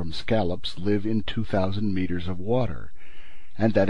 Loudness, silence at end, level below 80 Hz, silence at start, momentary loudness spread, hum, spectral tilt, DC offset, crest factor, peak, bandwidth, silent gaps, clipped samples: -27 LUFS; 0 s; -44 dBFS; 0 s; 6 LU; none; -7.5 dB/octave; 5%; 18 dB; -8 dBFS; 10 kHz; none; under 0.1%